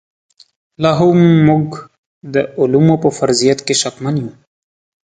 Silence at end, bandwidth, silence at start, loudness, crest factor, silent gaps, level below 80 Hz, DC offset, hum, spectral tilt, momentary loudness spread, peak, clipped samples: 0.75 s; 9.4 kHz; 0.8 s; -13 LUFS; 14 dB; 1.98-2.21 s; -50 dBFS; under 0.1%; none; -5.5 dB/octave; 11 LU; 0 dBFS; under 0.1%